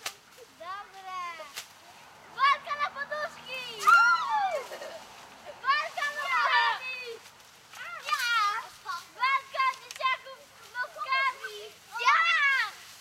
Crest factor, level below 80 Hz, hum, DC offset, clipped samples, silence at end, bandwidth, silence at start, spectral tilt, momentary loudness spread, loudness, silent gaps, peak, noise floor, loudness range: 20 dB; -78 dBFS; none; under 0.1%; under 0.1%; 0 s; 16 kHz; 0 s; 0.5 dB/octave; 21 LU; -27 LUFS; none; -10 dBFS; -53 dBFS; 4 LU